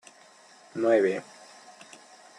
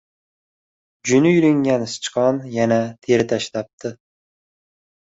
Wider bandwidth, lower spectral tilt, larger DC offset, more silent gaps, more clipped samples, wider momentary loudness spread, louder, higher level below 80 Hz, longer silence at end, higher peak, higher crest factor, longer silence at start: first, 11 kHz vs 8 kHz; about the same, -5.5 dB/octave vs -5.5 dB/octave; neither; second, none vs 3.73-3.78 s; neither; first, 26 LU vs 14 LU; second, -26 LUFS vs -19 LUFS; second, -84 dBFS vs -60 dBFS; about the same, 1.15 s vs 1.15 s; second, -10 dBFS vs -2 dBFS; about the same, 20 dB vs 18 dB; second, 0.75 s vs 1.05 s